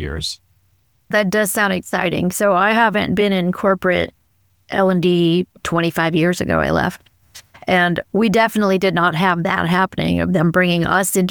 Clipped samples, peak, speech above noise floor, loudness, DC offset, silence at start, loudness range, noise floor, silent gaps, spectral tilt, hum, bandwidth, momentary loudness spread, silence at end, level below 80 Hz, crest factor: under 0.1%; -2 dBFS; 44 dB; -17 LUFS; 0.1%; 0 s; 2 LU; -61 dBFS; none; -5 dB/octave; none; over 20 kHz; 5 LU; 0 s; -42 dBFS; 14 dB